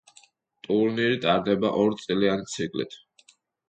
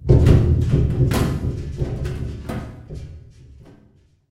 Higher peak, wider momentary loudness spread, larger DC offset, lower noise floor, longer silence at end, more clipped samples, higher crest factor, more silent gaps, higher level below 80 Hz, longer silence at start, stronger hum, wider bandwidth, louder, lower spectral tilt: second, -8 dBFS vs -2 dBFS; second, 8 LU vs 22 LU; neither; first, -60 dBFS vs -55 dBFS; second, 0.75 s vs 1.1 s; neither; about the same, 18 dB vs 18 dB; neither; second, -62 dBFS vs -26 dBFS; first, 0.7 s vs 0 s; neither; second, 9.4 kHz vs 16 kHz; second, -25 LUFS vs -20 LUFS; second, -5.5 dB/octave vs -8 dB/octave